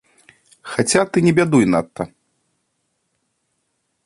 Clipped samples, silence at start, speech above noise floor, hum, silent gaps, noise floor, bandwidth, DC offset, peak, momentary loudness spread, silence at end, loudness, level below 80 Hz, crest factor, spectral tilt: under 0.1%; 0.65 s; 55 dB; none; none; -71 dBFS; 11.5 kHz; under 0.1%; 0 dBFS; 16 LU; 2 s; -17 LUFS; -54 dBFS; 20 dB; -5 dB/octave